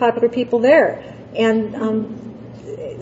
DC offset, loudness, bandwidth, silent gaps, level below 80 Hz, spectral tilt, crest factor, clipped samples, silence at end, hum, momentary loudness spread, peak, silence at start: under 0.1%; -17 LUFS; 8 kHz; none; -56 dBFS; -6.5 dB/octave; 16 dB; under 0.1%; 0 s; none; 20 LU; -2 dBFS; 0 s